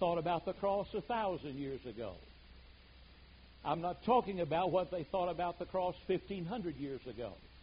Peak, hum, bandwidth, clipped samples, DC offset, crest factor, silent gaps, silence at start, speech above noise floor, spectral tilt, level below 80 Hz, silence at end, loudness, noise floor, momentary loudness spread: -18 dBFS; none; 5 kHz; under 0.1%; under 0.1%; 20 dB; none; 0 s; 22 dB; -5 dB/octave; -60 dBFS; 0 s; -38 LUFS; -59 dBFS; 13 LU